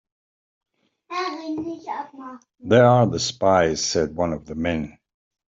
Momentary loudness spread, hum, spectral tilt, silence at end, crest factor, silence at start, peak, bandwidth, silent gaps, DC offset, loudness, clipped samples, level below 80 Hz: 20 LU; none; -5 dB/octave; 0.65 s; 20 dB; 1.1 s; -4 dBFS; 8 kHz; none; under 0.1%; -21 LUFS; under 0.1%; -52 dBFS